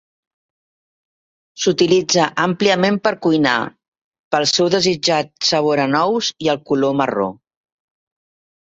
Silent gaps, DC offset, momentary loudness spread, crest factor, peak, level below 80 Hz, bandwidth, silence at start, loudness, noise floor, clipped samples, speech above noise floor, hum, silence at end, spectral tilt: 3.88-3.92 s, 4.01-4.12 s, 4.19-4.31 s; under 0.1%; 6 LU; 18 dB; -2 dBFS; -60 dBFS; 8 kHz; 1.55 s; -17 LUFS; under -90 dBFS; under 0.1%; over 74 dB; none; 1.35 s; -4 dB/octave